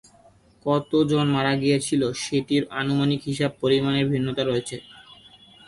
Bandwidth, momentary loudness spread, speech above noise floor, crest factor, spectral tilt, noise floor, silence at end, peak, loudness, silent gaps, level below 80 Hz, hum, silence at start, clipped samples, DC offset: 11.5 kHz; 5 LU; 33 dB; 16 dB; -5.5 dB/octave; -55 dBFS; 0.65 s; -8 dBFS; -23 LUFS; none; -56 dBFS; none; 0.65 s; under 0.1%; under 0.1%